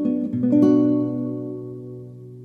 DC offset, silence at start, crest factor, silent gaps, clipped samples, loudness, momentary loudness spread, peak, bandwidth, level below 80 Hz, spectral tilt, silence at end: under 0.1%; 0 s; 16 dB; none; under 0.1%; -20 LUFS; 21 LU; -6 dBFS; 6.2 kHz; -64 dBFS; -10.5 dB/octave; 0 s